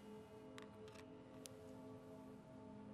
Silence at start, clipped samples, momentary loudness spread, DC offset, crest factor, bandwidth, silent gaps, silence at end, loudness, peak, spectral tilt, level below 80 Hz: 0 s; under 0.1%; 2 LU; under 0.1%; 28 dB; 13 kHz; none; 0 s; -58 LUFS; -28 dBFS; -5.5 dB/octave; -80 dBFS